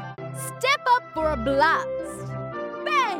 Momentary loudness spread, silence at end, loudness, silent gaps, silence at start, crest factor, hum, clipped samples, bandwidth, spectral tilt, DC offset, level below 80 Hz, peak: 13 LU; 0 s; -24 LUFS; none; 0 s; 16 dB; none; under 0.1%; 17 kHz; -4 dB/octave; under 0.1%; -46 dBFS; -8 dBFS